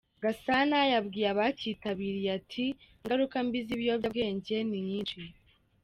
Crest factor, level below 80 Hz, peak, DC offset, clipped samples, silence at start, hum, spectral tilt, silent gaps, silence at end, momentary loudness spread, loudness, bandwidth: 16 dB; -64 dBFS; -14 dBFS; under 0.1%; under 0.1%; 0.2 s; none; -6.5 dB/octave; none; 0.55 s; 9 LU; -31 LUFS; 13.5 kHz